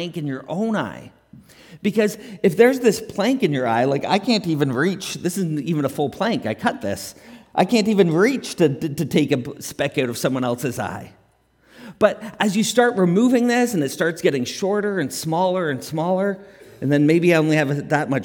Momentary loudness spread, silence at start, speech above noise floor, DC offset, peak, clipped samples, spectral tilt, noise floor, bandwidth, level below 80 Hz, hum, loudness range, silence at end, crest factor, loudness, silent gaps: 10 LU; 0 s; 39 dB; under 0.1%; -2 dBFS; under 0.1%; -5.5 dB/octave; -59 dBFS; 18 kHz; -62 dBFS; none; 4 LU; 0 s; 20 dB; -20 LUFS; none